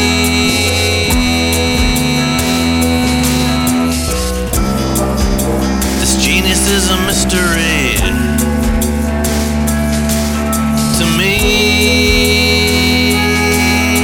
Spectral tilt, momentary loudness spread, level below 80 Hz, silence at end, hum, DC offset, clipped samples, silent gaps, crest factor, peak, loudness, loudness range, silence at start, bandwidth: -3.5 dB/octave; 5 LU; -20 dBFS; 0 s; none; under 0.1%; under 0.1%; none; 12 dB; 0 dBFS; -12 LUFS; 3 LU; 0 s; 20 kHz